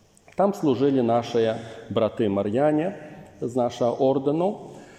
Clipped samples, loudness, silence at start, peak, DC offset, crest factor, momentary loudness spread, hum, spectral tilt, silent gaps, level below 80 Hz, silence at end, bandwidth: under 0.1%; -24 LUFS; 0.4 s; -8 dBFS; under 0.1%; 16 dB; 12 LU; none; -7.5 dB/octave; none; -66 dBFS; 0.05 s; 13.5 kHz